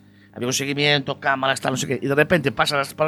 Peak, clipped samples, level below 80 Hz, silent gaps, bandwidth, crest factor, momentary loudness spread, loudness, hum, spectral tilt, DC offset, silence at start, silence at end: -2 dBFS; under 0.1%; -54 dBFS; none; 19 kHz; 18 dB; 5 LU; -21 LUFS; none; -4 dB/octave; under 0.1%; 0.35 s; 0 s